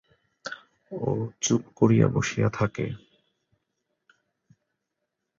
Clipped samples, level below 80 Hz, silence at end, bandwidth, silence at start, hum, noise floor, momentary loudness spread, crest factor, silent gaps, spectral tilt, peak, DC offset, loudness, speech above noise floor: under 0.1%; -56 dBFS; 2.45 s; 7.6 kHz; 0.45 s; none; -82 dBFS; 20 LU; 22 dB; none; -5.5 dB/octave; -6 dBFS; under 0.1%; -25 LUFS; 58 dB